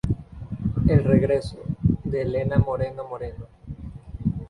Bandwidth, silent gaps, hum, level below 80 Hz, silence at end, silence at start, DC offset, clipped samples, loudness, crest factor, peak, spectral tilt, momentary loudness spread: 10.5 kHz; none; none; -36 dBFS; 0 s; 0.05 s; under 0.1%; under 0.1%; -24 LUFS; 18 dB; -6 dBFS; -9.5 dB/octave; 19 LU